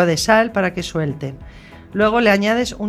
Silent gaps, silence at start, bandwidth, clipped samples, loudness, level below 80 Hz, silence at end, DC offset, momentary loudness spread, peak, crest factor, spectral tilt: none; 0 s; 15 kHz; under 0.1%; -17 LUFS; -42 dBFS; 0 s; under 0.1%; 15 LU; 0 dBFS; 18 dB; -5 dB/octave